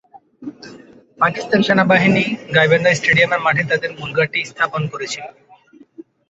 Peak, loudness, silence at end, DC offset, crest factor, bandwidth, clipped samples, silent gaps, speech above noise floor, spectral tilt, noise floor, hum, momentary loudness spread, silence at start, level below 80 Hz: -2 dBFS; -16 LUFS; 0.3 s; under 0.1%; 16 dB; 8.2 kHz; under 0.1%; none; 26 dB; -5 dB/octave; -42 dBFS; none; 17 LU; 0.15 s; -54 dBFS